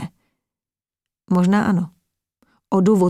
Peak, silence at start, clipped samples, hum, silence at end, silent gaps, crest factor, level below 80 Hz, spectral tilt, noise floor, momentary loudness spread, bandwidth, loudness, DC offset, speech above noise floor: -4 dBFS; 0 s; under 0.1%; none; 0 s; none; 16 dB; -60 dBFS; -8 dB/octave; under -90 dBFS; 13 LU; 12 kHz; -19 LUFS; under 0.1%; over 74 dB